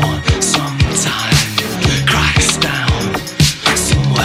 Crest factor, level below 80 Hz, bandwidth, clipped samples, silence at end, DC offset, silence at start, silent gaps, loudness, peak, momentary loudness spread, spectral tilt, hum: 14 dB; -26 dBFS; 16 kHz; under 0.1%; 0 s; under 0.1%; 0 s; none; -13 LUFS; 0 dBFS; 4 LU; -3.5 dB/octave; none